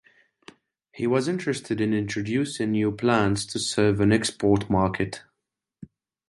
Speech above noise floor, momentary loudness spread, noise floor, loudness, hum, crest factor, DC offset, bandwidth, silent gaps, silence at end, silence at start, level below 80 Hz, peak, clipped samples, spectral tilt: 60 dB; 7 LU; -83 dBFS; -24 LUFS; none; 18 dB; under 0.1%; 11.5 kHz; none; 0.45 s; 0.95 s; -50 dBFS; -6 dBFS; under 0.1%; -5.5 dB/octave